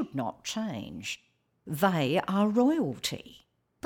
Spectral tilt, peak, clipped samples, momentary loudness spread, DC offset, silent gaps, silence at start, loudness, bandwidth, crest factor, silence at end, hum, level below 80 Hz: -5.5 dB/octave; -12 dBFS; under 0.1%; 13 LU; under 0.1%; none; 0 s; -29 LUFS; 18 kHz; 18 dB; 0.5 s; none; -66 dBFS